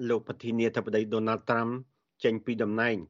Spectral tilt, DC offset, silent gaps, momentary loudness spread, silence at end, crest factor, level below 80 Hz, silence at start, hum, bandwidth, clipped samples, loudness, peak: -5 dB/octave; under 0.1%; none; 5 LU; 0.05 s; 16 dB; -72 dBFS; 0 s; none; 7.4 kHz; under 0.1%; -30 LUFS; -12 dBFS